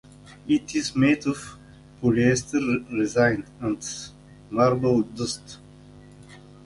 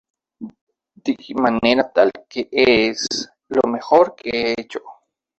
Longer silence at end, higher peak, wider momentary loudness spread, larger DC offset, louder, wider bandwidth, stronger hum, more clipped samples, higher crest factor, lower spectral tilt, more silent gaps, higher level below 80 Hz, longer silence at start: second, 0.25 s vs 0.45 s; second, -6 dBFS vs -2 dBFS; second, 15 LU vs 18 LU; neither; second, -24 LUFS vs -18 LUFS; first, 11.5 kHz vs 8.4 kHz; first, 50 Hz at -45 dBFS vs none; neither; about the same, 18 dB vs 18 dB; first, -5.5 dB/octave vs -3.5 dB/octave; second, none vs 0.61-0.67 s; about the same, -52 dBFS vs -54 dBFS; about the same, 0.3 s vs 0.4 s